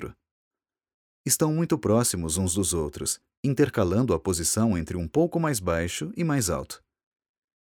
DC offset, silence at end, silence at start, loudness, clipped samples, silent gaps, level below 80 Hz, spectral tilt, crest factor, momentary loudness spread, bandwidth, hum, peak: under 0.1%; 0.9 s; 0 s; -25 LUFS; under 0.1%; 0.31-0.51 s, 0.94-1.25 s, 3.37-3.43 s; -46 dBFS; -5 dB/octave; 18 dB; 7 LU; 19 kHz; none; -8 dBFS